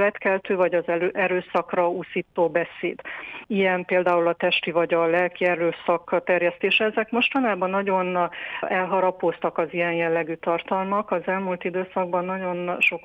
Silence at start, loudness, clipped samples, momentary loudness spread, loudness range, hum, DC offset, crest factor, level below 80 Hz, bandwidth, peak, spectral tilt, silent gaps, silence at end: 0 s; -23 LUFS; under 0.1%; 7 LU; 3 LU; none; under 0.1%; 14 dB; -68 dBFS; 8.4 kHz; -10 dBFS; -7 dB/octave; none; 0.05 s